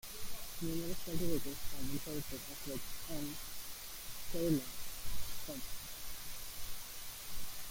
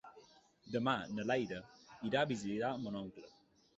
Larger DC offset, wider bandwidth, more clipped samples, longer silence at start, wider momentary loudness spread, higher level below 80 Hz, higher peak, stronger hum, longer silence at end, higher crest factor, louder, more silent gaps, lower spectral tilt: neither; first, 17 kHz vs 8 kHz; neither; about the same, 0.05 s vs 0.05 s; second, 8 LU vs 16 LU; first, -52 dBFS vs -72 dBFS; about the same, -20 dBFS vs -20 dBFS; neither; second, 0 s vs 0.5 s; about the same, 16 dB vs 20 dB; second, -43 LUFS vs -39 LUFS; neither; about the same, -4 dB/octave vs -4 dB/octave